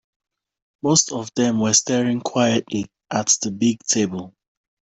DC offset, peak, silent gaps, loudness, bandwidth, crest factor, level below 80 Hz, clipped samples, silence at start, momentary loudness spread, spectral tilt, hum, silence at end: under 0.1%; -2 dBFS; none; -20 LUFS; 8.4 kHz; 18 dB; -60 dBFS; under 0.1%; 0.85 s; 10 LU; -3.5 dB/octave; none; 0.6 s